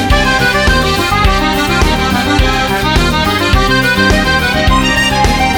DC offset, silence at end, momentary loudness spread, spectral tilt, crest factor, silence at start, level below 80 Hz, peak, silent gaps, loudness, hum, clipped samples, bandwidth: under 0.1%; 0 s; 2 LU; -4.5 dB/octave; 10 dB; 0 s; -18 dBFS; 0 dBFS; none; -10 LUFS; none; under 0.1%; over 20 kHz